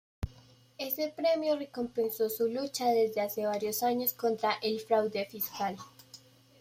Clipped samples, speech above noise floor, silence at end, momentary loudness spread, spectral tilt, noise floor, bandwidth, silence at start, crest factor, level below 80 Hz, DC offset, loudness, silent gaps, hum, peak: under 0.1%; 28 dB; 0.45 s; 13 LU; -4 dB/octave; -59 dBFS; 16 kHz; 0.2 s; 18 dB; -58 dBFS; under 0.1%; -31 LUFS; none; none; -14 dBFS